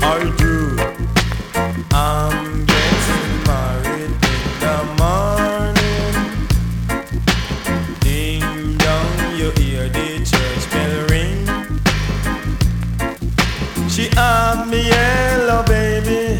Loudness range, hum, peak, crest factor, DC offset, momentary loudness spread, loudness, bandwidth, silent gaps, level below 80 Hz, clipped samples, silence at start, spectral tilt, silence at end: 3 LU; none; -2 dBFS; 14 dB; under 0.1%; 6 LU; -17 LUFS; 19.5 kHz; none; -22 dBFS; under 0.1%; 0 s; -5 dB/octave; 0 s